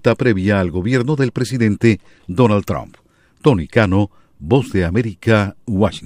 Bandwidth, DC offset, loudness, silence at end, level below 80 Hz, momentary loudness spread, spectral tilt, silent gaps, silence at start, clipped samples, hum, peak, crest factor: 15.5 kHz; under 0.1%; -17 LUFS; 0 s; -40 dBFS; 8 LU; -7.5 dB/octave; none; 0.05 s; under 0.1%; none; 0 dBFS; 16 dB